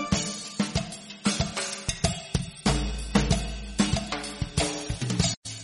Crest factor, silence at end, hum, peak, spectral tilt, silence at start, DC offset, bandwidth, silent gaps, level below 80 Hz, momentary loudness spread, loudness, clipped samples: 22 dB; 0 s; none; -8 dBFS; -4 dB/octave; 0 s; under 0.1%; 11.5 kHz; 5.37-5.42 s; -36 dBFS; 6 LU; -28 LUFS; under 0.1%